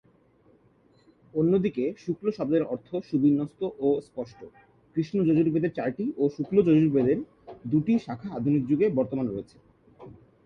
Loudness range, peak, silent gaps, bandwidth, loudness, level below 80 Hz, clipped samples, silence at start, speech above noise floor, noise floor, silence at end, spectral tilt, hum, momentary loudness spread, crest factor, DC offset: 3 LU; -10 dBFS; none; 6.6 kHz; -26 LUFS; -62 dBFS; under 0.1%; 1.35 s; 36 dB; -62 dBFS; 0.35 s; -9.5 dB/octave; none; 11 LU; 18 dB; under 0.1%